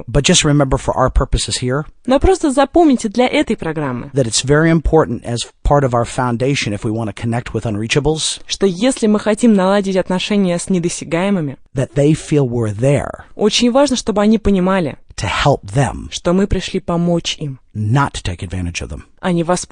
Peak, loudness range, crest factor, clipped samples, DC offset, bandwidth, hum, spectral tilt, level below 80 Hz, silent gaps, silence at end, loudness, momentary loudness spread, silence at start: 0 dBFS; 3 LU; 16 dB; under 0.1%; 0.1%; 10.5 kHz; none; -5 dB/octave; -30 dBFS; none; 0.05 s; -16 LUFS; 9 LU; 0.1 s